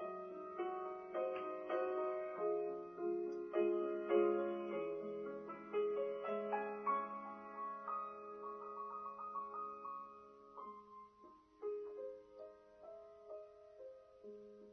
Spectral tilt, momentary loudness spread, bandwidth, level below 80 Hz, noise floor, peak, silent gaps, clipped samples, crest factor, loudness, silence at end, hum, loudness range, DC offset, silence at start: -5 dB/octave; 19 LU; 6 kHz; -86 dBFS; -64 dBFS; -24 dBFS; none; under 0.1%; 20 dB; -43 LUFS; 0 s; none; 13 LU; under 0.1%; 0 s